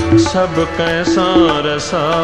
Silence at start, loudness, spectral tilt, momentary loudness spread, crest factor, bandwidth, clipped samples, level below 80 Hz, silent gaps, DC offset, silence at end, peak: 0 s; -14 LUFS; -5 dB/octave; 5 LU; 12 dB; 10 kHz; under 0.1%; -34 dBFS; none; 0.8%; 0 s; 0 dBFS